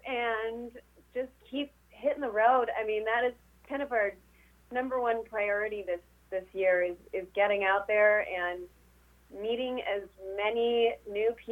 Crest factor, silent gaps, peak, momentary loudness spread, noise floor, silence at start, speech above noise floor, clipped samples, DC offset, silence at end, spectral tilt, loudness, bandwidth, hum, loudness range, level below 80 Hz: 18 dB; none; -12 dBFS; 14 LU; -61 dBFS; 0.05 s; 31 dB; under 0.1%; under 0.1%; 0 s; -5 dB/octave; -30 LUFS; 16 kHz; 60 Hz at -65 dBFS; 3 LU; -62 dBFS